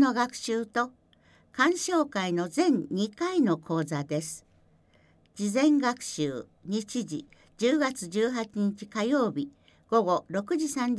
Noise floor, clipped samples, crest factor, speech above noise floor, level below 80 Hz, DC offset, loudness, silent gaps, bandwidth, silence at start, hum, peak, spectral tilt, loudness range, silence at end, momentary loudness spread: -62 dBFS; under 0.1%; 18 dB; 35 dB; -70 dBFS; under 0.1%; -28 LUFS; none; 11 kHz; 0 s; none; -10 dBFS; -5 dB/octave; 3 LU; 0 s; 9 LU